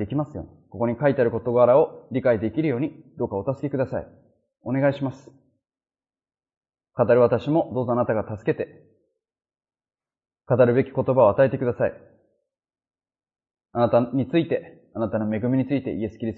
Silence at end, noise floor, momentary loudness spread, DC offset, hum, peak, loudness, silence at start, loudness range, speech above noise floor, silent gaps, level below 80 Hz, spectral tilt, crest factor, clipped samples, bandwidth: 0 s; under -90 dBFS; 13 LU; under 0.1%; none; -4 dBFS; -23 LUFS; 0 s; 6 LU; over 68 dB; 6.57-6.61 s; -58 dBFS; -10 dB/octave; 20 dB; under 0.1%; 4.5 kHz